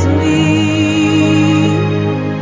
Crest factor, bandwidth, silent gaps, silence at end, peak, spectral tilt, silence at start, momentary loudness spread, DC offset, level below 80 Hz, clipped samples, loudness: 12 dB; 7.6 kHz; none; 0 s; 0 dBFS; -6.5 dB/octave; 0 s; 4 LU; under 0.1%; -30 dBFS; under 0.1%; -12 LUFS